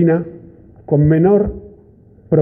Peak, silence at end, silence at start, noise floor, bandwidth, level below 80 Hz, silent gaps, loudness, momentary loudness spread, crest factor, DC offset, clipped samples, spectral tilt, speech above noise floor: -2 dBFS; 0 s; 0 s; -45 dBFS; 3.2 kHz; -38 dBFS; none; -15 LUFS; 17 LU; 14 dB; under 0.1%; under 0.1%; -13.5 dB/octave; 33 dB